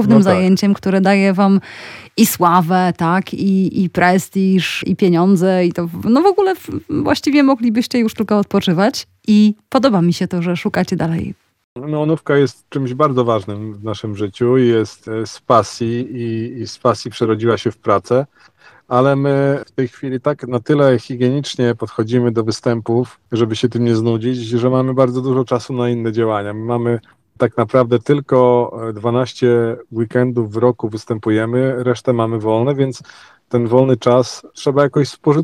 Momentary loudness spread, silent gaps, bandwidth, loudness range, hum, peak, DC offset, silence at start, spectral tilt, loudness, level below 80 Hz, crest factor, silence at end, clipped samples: 10 LU; 11.64-11.76 s; 17.5 kHz; 3 LU; none; 0 dBFS; under 0.1%; 0 s; -6.5 dB/octave; -16 LUFS; -56 dBFS; 16 dB; 0 s; under 0.1%